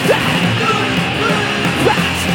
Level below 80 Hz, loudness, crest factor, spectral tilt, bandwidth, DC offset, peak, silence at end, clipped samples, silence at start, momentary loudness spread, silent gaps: -40 dBFS; -14 LUFS; 14 dB; -4.5 dB/octave; 17 kHz; under 0.1%; 0 dBFS; 0 s; under 0.1%; 0 s; 2 LU; none